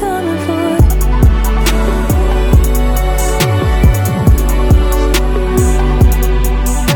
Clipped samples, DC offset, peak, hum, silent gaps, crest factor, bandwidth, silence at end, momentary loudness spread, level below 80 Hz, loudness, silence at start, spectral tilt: under 0.1%; under 0.1%; 0 dBFS; none; none; 10 dB; 19 kHz; 0 s; 3 LU; -12 dBFS; -13 LUFS; 0 s; -6 dB/octave